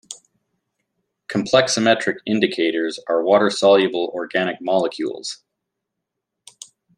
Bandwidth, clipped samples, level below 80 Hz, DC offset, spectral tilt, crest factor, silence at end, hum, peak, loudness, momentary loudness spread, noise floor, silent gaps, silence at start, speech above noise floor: 11 kHz; under 0.1%; -64 dBFS; under 0.1%; -4 dB/octave; 20 dB; 1.6 s; none; -2 dBFS; -19 LUFS; 13 LU; -81 dBFS; none; 0.1 s; 62 dB